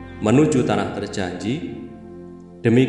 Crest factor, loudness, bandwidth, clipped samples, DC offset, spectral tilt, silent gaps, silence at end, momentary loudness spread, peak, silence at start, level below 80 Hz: 18 dB; -21 LUFS; 11 kHz; under 0.1%; under 0.1%; -6.5 dB/octave; none; 0 s; 22 LU; -4 dBFS; 0 s; -50 dBFS